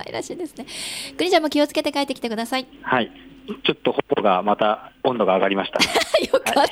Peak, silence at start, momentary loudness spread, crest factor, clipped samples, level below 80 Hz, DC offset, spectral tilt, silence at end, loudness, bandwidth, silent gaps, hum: -4 dBFS; 0 s; 12 LU; 16 dB; under 0.1%; -58 dBFS; under 0.1%; -3.5 dB/octave; 0 s; -21 LUFS; 16.5 kHz; none; none